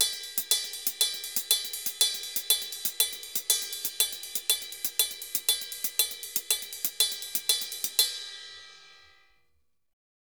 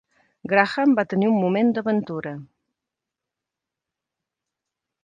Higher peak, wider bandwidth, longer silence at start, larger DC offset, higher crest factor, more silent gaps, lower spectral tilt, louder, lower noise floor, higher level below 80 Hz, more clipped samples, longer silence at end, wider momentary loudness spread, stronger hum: second, -6 dBFS vs -2 dBFS; first, over 20 kHz vs 7.6 kHz; second, 0 s vs 0.45 s; neither; about the same, 26 dB vs 22 dB; neither; second, 3 dB/octave vs -8 dB/octave; second, -27 LUFS vs -21 LUFS; second, -76 dBFS vs -86 dBFS; about the same, -72 dBFS vs -70 dBFS; neither; second, 1.3 s vs 2.6 s; second, 6 LU vs 15 LU; neither